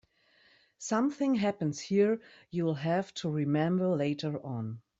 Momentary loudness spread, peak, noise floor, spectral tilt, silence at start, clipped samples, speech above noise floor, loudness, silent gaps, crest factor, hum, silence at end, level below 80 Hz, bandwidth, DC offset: 9 LU; -14 dBFS; -66 dBFS; -6.5 dB/octave; 0.8 s; under 0.1%; 36 dB; -31 LUFS; none; 16 dB; none; 0.2 s; -72 dBFS; 8 kHz; under 0.1%